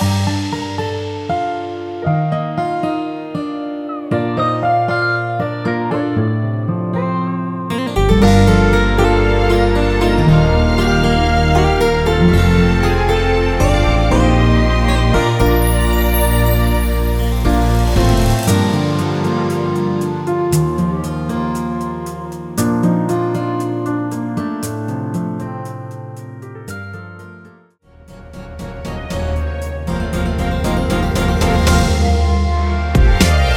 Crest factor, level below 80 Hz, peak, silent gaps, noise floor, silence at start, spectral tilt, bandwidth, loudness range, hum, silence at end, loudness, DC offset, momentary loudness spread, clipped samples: 14 dB; -20 dBFS; 0 dBFS; none; -46 dBFS; 0 s; -6 dB/octave; over 20 kHz; 11 LU; none; 0 s; -16 LUFS; under 0.1%; 12 LU; under 0.1%